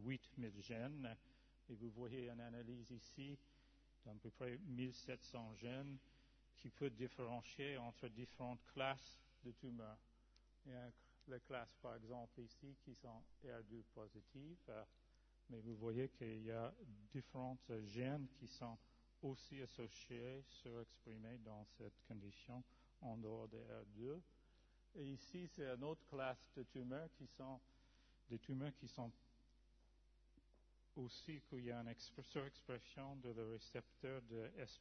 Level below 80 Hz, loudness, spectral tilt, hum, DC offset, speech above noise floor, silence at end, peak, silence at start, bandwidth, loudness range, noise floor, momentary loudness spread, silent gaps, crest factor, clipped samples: -74 dBFS; -54 LUFS; -5.5 dB/octave; none; under 0.1%; 21 dB; 0 s; -30 dBFS; 0 s; 6.4 kHz; 6 LU; -74 dBFS; 11 LU; none; 24 dB; under 0.1%